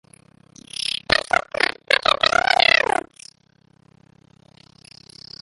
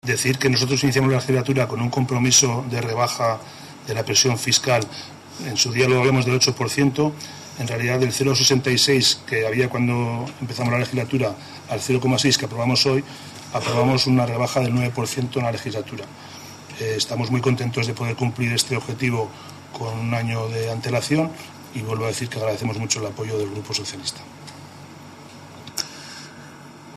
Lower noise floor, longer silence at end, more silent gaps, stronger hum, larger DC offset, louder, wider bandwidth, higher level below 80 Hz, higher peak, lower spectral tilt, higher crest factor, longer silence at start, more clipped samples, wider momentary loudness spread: first, -58 dBFS vs -41 dBFS; first, 2.65 s vs 0 s; neither; neither; neither; first, -18 LUFS vs -21 LUFS; second, 11.5 kHz vs 14 kHz; about the same, -52 dBFS vs -56 dBFS; first, 0 dBFS vs -4 dBFS; second, -1.5 dB/octave vs -4 dB/octave; first, 24 dB vs 18 dB; first, 0.85 s vs 0.05 s; neither; second, 14 LU vs 20 LU